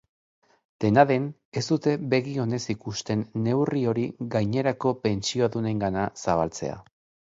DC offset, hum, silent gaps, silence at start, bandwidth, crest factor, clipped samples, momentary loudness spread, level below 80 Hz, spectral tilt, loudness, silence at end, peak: under 0.1%; none; 1.45-1.52 s; 0.8 s; 7.8 kHz; 22 dB; under 0.1%; 9 LU; -56 dBFS; -6 dB/octave; -26 LUFS; 0.55 s; -4 dBFS